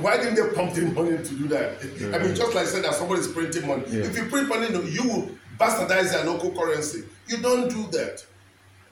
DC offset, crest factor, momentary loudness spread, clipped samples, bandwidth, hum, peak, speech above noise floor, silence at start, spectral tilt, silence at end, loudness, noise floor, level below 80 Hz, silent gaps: under 0.1%; 18 dB; 8 LU; under 0.1%; 19.5 kHz; none; -8 dBFS; 29 dB; 0 s; -4.5 dB/octave; 0.65 s; -25 LUFS; -54 dBFS; -64 dBFS; none